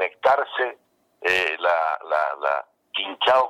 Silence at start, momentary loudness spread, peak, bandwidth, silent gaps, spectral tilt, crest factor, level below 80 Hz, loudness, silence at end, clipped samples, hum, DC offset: 0 s; 8 LU; -8 dBFS; 15 kHz; none; -2 dB/octave; 16 dB; -68 dBFS; -23 LUFS; 0 s; under 0.1%; none; under 0.1%